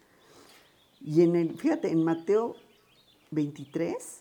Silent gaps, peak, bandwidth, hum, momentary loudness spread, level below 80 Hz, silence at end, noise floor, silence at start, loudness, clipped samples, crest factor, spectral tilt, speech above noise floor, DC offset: none; -10 dBFS; 17 kHz; none; 10 LU; -78 dBFS; 0.05 s; -62 dBFS; 1 s; -28 LUFS; under 0.1%; 18 dB; -7.5 dB/octave; 35 dB; under 0.1%